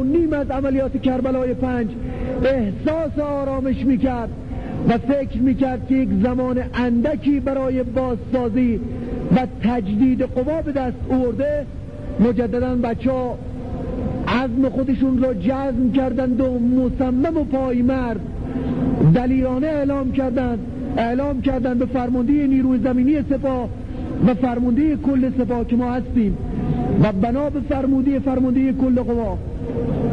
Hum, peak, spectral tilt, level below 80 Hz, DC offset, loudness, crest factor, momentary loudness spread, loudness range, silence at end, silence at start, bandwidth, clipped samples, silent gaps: none; -6 dBFS; -9.5 dB/octave; -34 dBFS; 0.9%; -20 LUFS; 14 dB; 8 LU; 2 LU; 0 s; 0 s; 5.4 kHz; under 0.1%; none